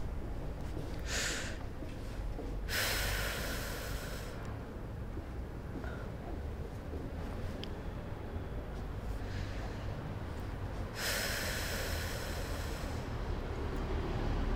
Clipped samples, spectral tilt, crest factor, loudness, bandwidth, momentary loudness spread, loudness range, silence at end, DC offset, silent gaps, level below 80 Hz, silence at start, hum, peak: under 0.1%; -4 dB/octave; 18 dB; -40 LUFS; 16 kHz; 9 LU; 6 LU; 0 s; under 0.1%; none; -42 dBFS; 0 s; none; -20 dBFS